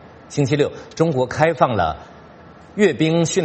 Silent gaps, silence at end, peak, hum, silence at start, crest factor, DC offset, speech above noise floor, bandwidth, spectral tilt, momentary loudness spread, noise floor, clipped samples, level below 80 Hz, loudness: none; 0 s; 0 dBFS; none; 0.05 s; 20 dB; under 0.1%; 25 dB; 8.8 kHz; -5.5 dB/octave; 9 LU; -43 dBFS; under 0.1%; -48 dBFS; -19 LUFS